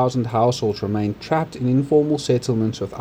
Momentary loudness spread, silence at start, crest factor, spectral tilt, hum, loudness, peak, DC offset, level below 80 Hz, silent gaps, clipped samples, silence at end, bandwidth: 5 LU; 0 s; 14 dB; -7 dB/octave; none; -21 LUFS; -6 dBFS; under 0.1%; -52 dBFS; none; under 0.1%; 0 s; 16 kHz